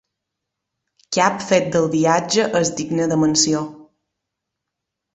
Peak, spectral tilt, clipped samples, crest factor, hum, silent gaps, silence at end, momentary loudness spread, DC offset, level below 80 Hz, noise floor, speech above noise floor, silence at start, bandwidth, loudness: 0 dBFS; -4 dB/octave; under 0.1%; 20 dB; none; none; 1.3 s; 6 LU; under 0.1%; -58 dBFS; -81 dBFS; 63 dB; 1.1 s; 8.4 kHz; -18 LUFS